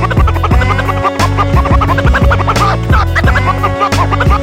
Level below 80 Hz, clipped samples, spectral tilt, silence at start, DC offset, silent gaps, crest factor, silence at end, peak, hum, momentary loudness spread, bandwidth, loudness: -16 dBFS; under 0.1%; -6 dB/octave; 0 s; under 0.1%; none; 10 dB; 0 s; 0 dBFS; none; 2 LU; 15.5 kHz; -11 LUFS